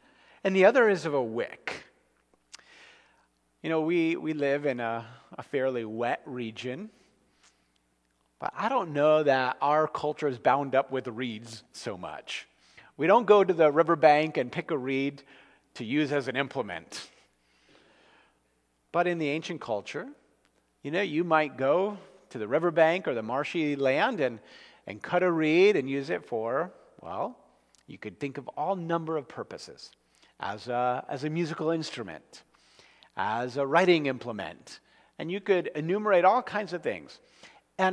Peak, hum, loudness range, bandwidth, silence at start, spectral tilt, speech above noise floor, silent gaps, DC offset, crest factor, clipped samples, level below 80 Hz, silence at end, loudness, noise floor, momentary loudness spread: -6 dBFS; none; 9 LU; 11 kHz; 0.45 s; -6 dB/octave; 44 dB; none; under 0.1%; 22 dB; under 0.1%; -76 dBFS; 0 s; -28 LUFS; -72 dBFS; 19 LU